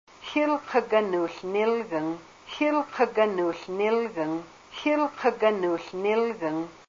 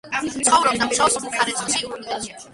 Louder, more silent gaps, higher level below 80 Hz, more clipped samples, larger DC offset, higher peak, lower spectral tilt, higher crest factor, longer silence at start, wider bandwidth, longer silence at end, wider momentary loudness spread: second, -26 LUFS vs -20 LUFS; neither; second, -68 dBFS vs -54 dBFS; neither; neither; second, -10 dBFS vs -2 dBFS; first, -5.5 dB/octave vs -1 dB/octave; about the same, 16 dB vs 20 dB; first, 0.2 s vs 0.05 s; second, 7.6 kHz vs 11.5 kHz; about the same, 0.1 s vs 0 s; second, 7 LU vs 12 LU